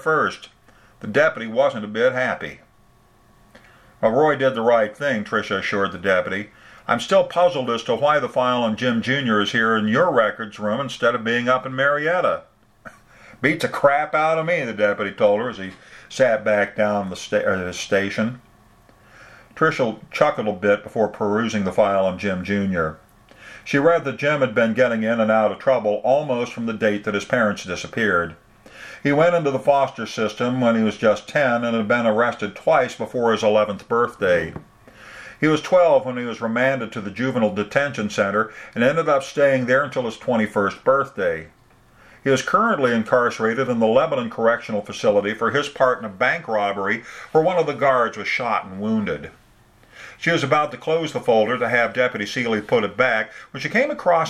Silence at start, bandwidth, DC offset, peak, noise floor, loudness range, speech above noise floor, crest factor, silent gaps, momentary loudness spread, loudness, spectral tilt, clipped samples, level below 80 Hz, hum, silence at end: 0 s; 12.5 kHz; under 0.1%; 0 dBFS; -55 dBFS; 3 LU; 35 dB; 20 dB; none; 7 LU; -20 LUFS; -5.5 dB/octave; under 0.1%; -58 dBFS; none; 0 s